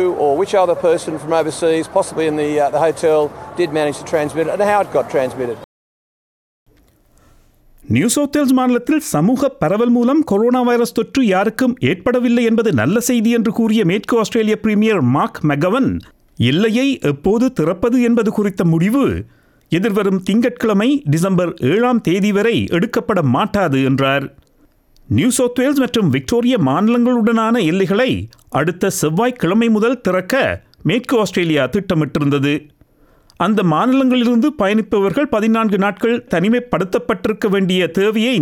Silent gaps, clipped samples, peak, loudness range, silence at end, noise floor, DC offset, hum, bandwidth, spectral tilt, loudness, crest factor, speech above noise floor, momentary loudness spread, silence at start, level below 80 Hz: 5.64-6.66 s; under 0.1%; -2 dBFS; 3 LU; 0 s; -53 dBFS; under 0.1%; none; 18 kHz; -6 dB/octave; -16 LUFS; 14 dB; 38 dB; 5 LU; 0 s; -48 dBFS